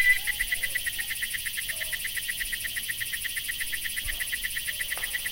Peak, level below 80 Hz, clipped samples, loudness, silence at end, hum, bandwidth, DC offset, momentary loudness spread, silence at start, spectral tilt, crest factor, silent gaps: -10 dBFS; -46 dBFS; under 0.1%; -28 LUFS; 0 s; none; 17 kHz; under 0.1%; 3 LU; 0 s; 1.5 dB/octave; 20 dB; none